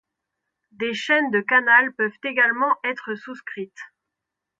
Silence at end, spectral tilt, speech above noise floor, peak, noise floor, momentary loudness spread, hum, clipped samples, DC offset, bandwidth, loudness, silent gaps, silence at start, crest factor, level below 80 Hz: 0.75 s; -4 dB/octave; 62 dB; -4 dBFS; -84 dBFS; 18 LU; none; under 0.1%; under 0.1%; 7.8 kHz; -20 LUFS; none; 0.8 s; 20 dB; -76 dBFS